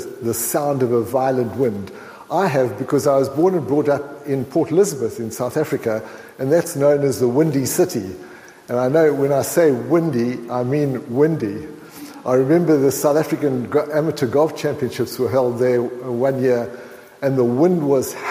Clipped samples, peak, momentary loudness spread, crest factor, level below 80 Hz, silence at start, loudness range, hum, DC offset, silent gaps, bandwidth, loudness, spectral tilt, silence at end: under 0.1%; -4 dBFS; 9 LU; 14 dB; -60 dBFS; 0 s; 2 LU; none; under 0.1%; none; 16 kHz; -19 LUFS; -6 dB/octave; 0 s